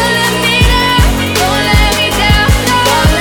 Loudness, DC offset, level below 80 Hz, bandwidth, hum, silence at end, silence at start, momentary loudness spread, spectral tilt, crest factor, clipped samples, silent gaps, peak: -9 LUFS; under 0.1%; -16 dBFS; over 20 kHz; none; 0 s; 0 s; 2 LU; -4 dB/octave; 10 dB; under 0.1%; none; 0 dBFS